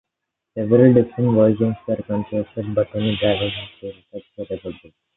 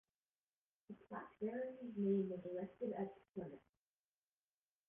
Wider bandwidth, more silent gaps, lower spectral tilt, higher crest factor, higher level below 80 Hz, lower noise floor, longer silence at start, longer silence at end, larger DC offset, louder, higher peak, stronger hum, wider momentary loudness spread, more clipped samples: first, 4.1 kHz vs 3.6 kHz; neither; first, -12 dB/octave vs -6.5 dB/octave; about the same, 18 dB vs 18 dB; first, -50 dBFS vs -82 dBFS; second, -81 dBFS vs under -90 dBFS; second, 0.55 s vs 0.9 s; second, 0.4 s vs 1.3 s; neither; first, -19 LUFS vs -45 LUFS; first, -2 dBFS vs -28 dBFS; second, none vs 50 Hz at -65 dBFS; first, 20 LU vs 16 LU; neither